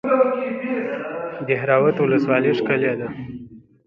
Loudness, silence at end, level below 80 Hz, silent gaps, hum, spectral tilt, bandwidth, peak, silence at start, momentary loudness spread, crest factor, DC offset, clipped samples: -20 LUFS; 0.3 s; -60 dBFS; none; none; -8.5 dB/octave; 6 kHz; -2 dBFS; 0.05 s; 13 LU; 18 dB; under 0.1%; under 0.1%